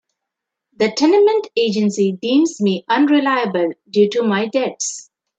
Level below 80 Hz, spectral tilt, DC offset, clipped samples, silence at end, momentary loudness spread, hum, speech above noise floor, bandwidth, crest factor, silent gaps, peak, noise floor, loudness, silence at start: -70 dBFS; -4.5 dB/octave; under 0.1%; under 0.1%; 0.35 s; 7 LU; none; 65 dB; 9.2 kHz; 14 dB; none; -2 dBFS; -81 dBFS; -17 LUFS; 0.8 s